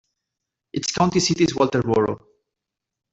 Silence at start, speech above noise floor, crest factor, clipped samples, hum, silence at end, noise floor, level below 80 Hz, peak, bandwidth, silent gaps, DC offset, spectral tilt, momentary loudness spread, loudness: 0.75 s; 64 dB; 20 dB; under 0.1%; none; 0.95 s; -85 dBFS; -54 dBFS; -4 dBFS; 8.2 kHz; none; under 0.1%; -4.5 dB/octave; 10 LU; -21 LUFS